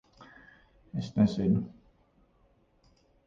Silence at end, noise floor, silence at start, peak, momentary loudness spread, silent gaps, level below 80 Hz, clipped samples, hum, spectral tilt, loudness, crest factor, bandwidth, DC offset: 1.6 s; -67 dBFS; 0.2 s; -14 dBFS; 25 LU; none; -58 dBFS; under 0.1%; none; -8.5 dB/octave; -29 LUFS; 20 dB; 7.4 kHz; under 0.1%